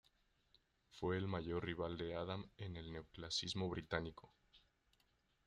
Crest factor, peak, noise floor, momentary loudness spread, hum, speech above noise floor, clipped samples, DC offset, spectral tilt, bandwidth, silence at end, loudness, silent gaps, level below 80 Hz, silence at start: 22 dB; -24 dBFS; -80 dBFS; 11 LU; none; 35 dB; under 0.1%; under 0.1%; -5 dB/octave; 10.5 kHz; 0.9 s; -45 LUFS; none; -66 dBFS; 0.9 s